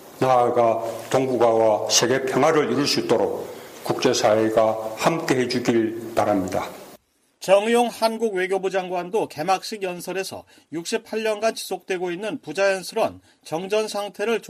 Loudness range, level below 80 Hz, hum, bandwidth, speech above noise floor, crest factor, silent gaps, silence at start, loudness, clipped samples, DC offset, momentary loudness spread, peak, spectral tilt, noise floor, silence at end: 6 LU; -64 dBFS; none; 15.5 kHz; 31 dB; 18 dB; none; 0 s; -22 LUFS; under 0.1%; under 0.1%; 11 LU; -4 dBFS; -4 dB/octave; -53 dBFS; 0 s